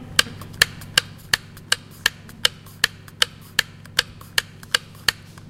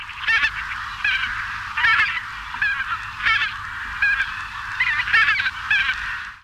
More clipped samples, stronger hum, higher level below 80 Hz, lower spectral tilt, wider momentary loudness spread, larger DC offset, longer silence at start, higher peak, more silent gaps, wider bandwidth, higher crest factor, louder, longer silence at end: neither; neither; about the same, -50 dBFS vs -46 dBFS; about the same, -0.5 dB/octave vs -1 dB/octave; second, 4 LU vs 12 LU; neither; about the same, 0 s vs 0 s; first, 0 dBFS vs -6 dBFS; neither; about the same, 17 kHz vs 15.5 kHz; first, 26 dB vs 16 dB; about the same, -22 LUFS vs -20 LUFS; first, 0.4 s vs 0.05 s